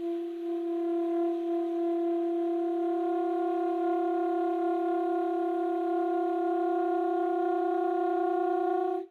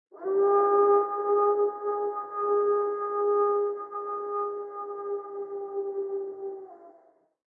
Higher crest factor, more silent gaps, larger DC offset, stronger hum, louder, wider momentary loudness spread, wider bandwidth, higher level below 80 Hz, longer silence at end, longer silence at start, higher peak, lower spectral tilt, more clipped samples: second, 10 dB vs 16 dB; neither; neither; neither; about the same, -29 LUFS vs -27 LUFS; second, 2 LU vs 14 LU; first, 4.3 kHz vs 2.3 kHz; first, -82 dBFS vs under -90 dBFS; second, 0.05 s vs 0.6 s; second, 0 s vs 0.15 s; second, -20 dBFS vs -12 dBFS; second, -5.5 dB/octave vs -9.5 dB/octave; neither